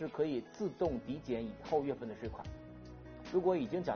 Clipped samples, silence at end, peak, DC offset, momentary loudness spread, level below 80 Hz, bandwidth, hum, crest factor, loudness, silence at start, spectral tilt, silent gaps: under 0.1%; 0 s; -20 dBFS; under 0.1%; 17 LU; -58 dBFS; 6.6 kHz; none; 18 dB; -37 LUFS; 0 s; -6.5 dB/octave; none